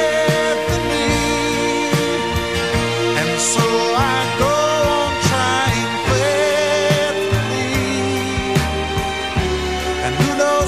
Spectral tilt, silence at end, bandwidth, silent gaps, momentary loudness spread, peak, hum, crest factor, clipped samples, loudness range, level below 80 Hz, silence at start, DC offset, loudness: -4 dB/octave; 0 s; 15.5 kHz; none; 4 LU; -2 dBFS; none; 16 dB; under 0.1%; 2 LU; -34 dBFS; 0 s; 0.5%; -17 LUFS